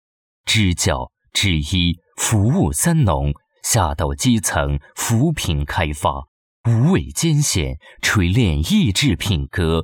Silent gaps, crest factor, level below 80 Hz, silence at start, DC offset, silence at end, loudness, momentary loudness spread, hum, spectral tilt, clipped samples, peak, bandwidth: 6.28-6.64 s; 14 dB; -32 dBFS; 0.45 s; under 0.1%; 0 s; -18 LUFS; 7 LU; none; -4.5 dB/octave; under 0.1%; -4 dBFS; 19 kHz